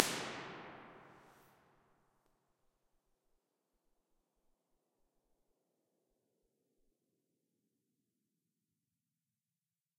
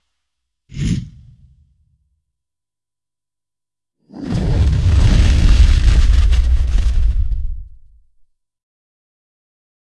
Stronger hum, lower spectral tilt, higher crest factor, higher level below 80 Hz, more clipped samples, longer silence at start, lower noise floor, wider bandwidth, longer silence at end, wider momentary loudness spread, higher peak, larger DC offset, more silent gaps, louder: neither; second, -2 dB/octave vs -6.5 dB/octave; first, 50 dB vs 16 dB; second, -84 dBFS vs -18 dBFS; neither; second, 0 s vs 0.75 s; about the same, under -90 dBFS vs -90 dBFS; first, 15.5 kHz vs 10.5 kHz; first, 8.55 s vs 2.35 s; first, 23 LU vs 16 LU; about the same, -2 dBFS vs 0 dBFS; neither; neither; second, -43 LUFS vs -16 LUFS